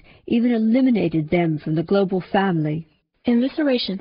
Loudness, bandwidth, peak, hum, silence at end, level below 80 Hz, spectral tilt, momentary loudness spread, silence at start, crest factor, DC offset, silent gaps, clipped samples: -20 LUFS; 5.4 kHz; -6 dBFS; none; 0 s; -54 dBFS; -6 dB/octave; 6 LU; 0.25 s; 14 dB; under 0.1%; none; under 0.1%